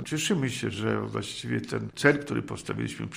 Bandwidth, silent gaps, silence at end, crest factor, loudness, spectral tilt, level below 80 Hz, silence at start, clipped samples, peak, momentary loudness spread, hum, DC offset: 15.5 kHz; none; 0 s; 22 dB; -29 LUFS; -5 dB/octave; -60 dBFS; 0 s; under 0.1%; -6 dBFS; 9 LU; none; under 0.1%